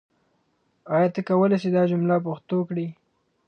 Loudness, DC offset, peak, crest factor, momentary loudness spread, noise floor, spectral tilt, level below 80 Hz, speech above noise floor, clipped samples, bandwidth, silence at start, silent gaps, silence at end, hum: -23 LUFS; under 0.1%; -8 dBFS; 16 dB; 8 LU; -69 dBFS; -9.5 dB/octave; -72 dBFS; 47 dB; under 0.1%; 6.6 kHz; 0.85 s; none; 0.55 s; none